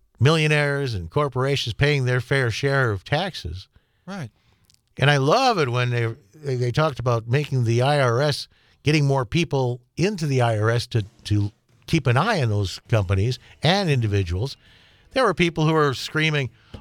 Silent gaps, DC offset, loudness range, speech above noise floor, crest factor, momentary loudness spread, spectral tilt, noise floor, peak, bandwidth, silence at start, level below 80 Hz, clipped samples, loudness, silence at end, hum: none; under 0.1%; 2 LU; 39 dB; 20 dB; 10 LU; -6 dB/octave; -60 dBFS; -2 dBFS; 14.5 kHz; 0.2 s; -50 dBFS; under 0.1%; -22 LUFS; 0 s; none